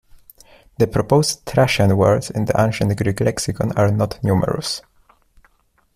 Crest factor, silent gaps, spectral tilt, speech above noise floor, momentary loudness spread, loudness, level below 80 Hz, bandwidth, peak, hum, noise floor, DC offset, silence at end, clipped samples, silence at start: 16 dB; none; -5.5 dB/octave; 42 dB; 6 LU; -18 LUFS; -44 dBFS; 15 kHz; -2 dBFS; none; -60 dBFS; under 0.1%; 1.15 s; under 0.1%; 0.8 s